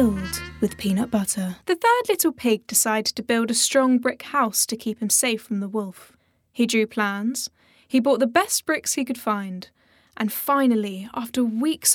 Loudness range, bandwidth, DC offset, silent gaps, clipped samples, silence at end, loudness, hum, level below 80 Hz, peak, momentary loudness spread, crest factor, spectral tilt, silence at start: 4 LU; over 20 kHz; under 0.1%; none; under 0.1%; 0 s; -22 LUFS; none; -56 dBFS; -4 dBFS; 10 LU; 18 dB; -3 dB/octave; 0 s